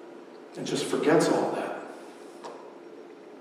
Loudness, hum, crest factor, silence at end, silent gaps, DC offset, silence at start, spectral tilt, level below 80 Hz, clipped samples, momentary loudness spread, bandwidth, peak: -27 LUFS; none; 20 dB; 0 s; none; under 0.1%; 0 s; -4.5 dB/octave; -82 dBFS; under 0.1%; 23 LU; 14.5 kHz; -10 dBFS